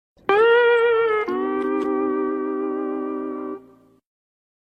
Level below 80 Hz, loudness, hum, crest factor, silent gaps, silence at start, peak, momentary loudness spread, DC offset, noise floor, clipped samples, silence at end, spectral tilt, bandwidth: -66 dBFS; -21 LUFS; none; 18 dB; none; 0.3 s; -4 dBFS; 14 LU; under 0.1%; -52 dBFS; under 0.1%; 1.1 s; -5.5 dB/octave; 5.2 kHz